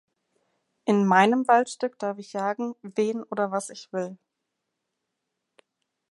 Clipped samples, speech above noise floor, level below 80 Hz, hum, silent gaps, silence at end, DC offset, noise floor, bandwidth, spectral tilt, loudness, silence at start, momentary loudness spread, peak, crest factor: under 0.1%; 57 dB; -82 dBFS; none; none; 1.95 s; under 0.1%; -82 dBFS; 11.5 kHz; -5.5 dB/octave; -25 LUFS; 0.85 s; 14 LU; -4 dBFS; 22 dB